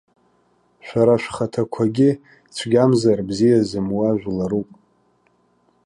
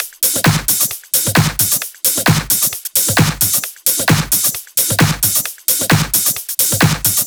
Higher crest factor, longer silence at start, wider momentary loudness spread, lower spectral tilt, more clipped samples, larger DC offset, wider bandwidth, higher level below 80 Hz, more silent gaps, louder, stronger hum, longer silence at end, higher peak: about the same, 16 dB vs 14 dB; first, 0.85 s vs 0 s; first, 11 LU vs 3 LU; first, -7 dB/octave vs -2.5 dB/octave; neither; neither; second, 11.5 kHz vs over 20 kHz; second, -54 dBFS vs -38 dBFS; neither; second, -19 LUFS vs -13 LUFS; first, 60 Hz at -40 dBFS vs none; first, 1.25 s vs 0 s; second, -4 dBFS vs 0 dBFS